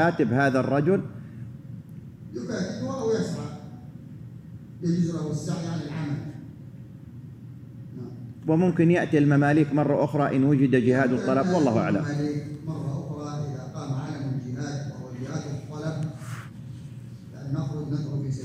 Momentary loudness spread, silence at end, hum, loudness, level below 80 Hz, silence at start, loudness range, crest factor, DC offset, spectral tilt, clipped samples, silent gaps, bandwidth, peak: 21 LU; 0 s; none; -26 LUFS; -60 dBFS; 0 s; 12 LU; 18 dB; under 0.1%; -7.5 dB/octave; under 0.1%; none; 10.5 kHz; -8 dBFS